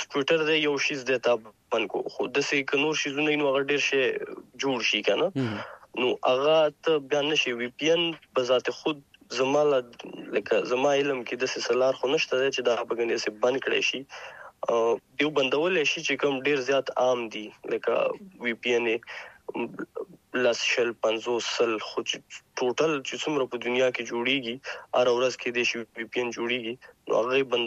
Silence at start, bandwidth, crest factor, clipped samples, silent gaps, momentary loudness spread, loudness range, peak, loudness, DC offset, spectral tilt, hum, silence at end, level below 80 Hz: 0 s; 8.2 kHz; 18 dB; under 0.1%; none; 11 LU; 3 LU; -8 dBFS; -26 LUFS; under 0.1%; -3.5 dB/octave; none; 0 s; -74 dBFS